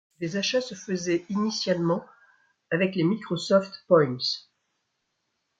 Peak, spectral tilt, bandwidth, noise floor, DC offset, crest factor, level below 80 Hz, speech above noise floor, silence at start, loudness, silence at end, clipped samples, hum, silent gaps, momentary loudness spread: -6 dBFS; -5 dB/octave; 9.2 kHz; -78 dBFS; under 0.1%; 20 dB; -70 dBFS; 52 dB; 0.2 s; -26 LUFS; 1.2 s; under 0.1%; none; none; 9 LU